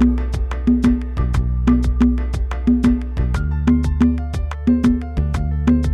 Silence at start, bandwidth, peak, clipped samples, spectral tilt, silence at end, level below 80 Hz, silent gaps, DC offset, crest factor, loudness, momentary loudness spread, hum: 0 s; 9.4 kHz; -2 dBFS; under 0.1%; -8.5 dB/octave; 0 s; -20 dBFS; none; under 0.1%; 14 dB; -19 LUFS; 6 LU; none